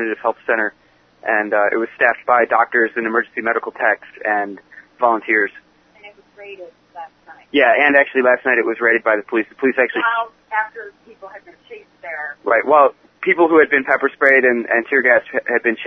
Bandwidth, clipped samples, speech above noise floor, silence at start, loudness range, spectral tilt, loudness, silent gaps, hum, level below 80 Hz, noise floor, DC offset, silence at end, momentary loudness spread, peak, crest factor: 6 kHz; under 0.1%; 28 dB; 0 s; 7 LU; -6.5 dB/octave; -16 LUFS; none; none; -66 dBFS; -45 dBFS; under 0.1%; 0 s; 15 LU; 0 dBFS; 18 dB